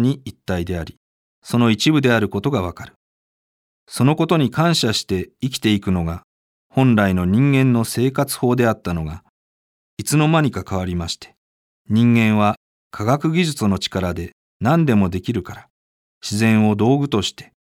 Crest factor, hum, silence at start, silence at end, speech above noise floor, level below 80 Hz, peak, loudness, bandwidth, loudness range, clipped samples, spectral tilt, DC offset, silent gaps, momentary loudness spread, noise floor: 16 dB; none; 0 s; 0.25 s; over 72 dB; -46 dBFS; -2 dBFS; -18 LUFS; 16.5 kHz; 3 LU; under 0.1%; -6 dB/octave; under 0.1%; 0.97-1.42 s, 2.96-3.87 s, 6.24-6.70 s, 9.29-9.97 s, 11.37-11.85 s, 12.57-12.91 s, 14.32-14.60 s, 15.70-16.21 s; 13 LU; under -90 dBFS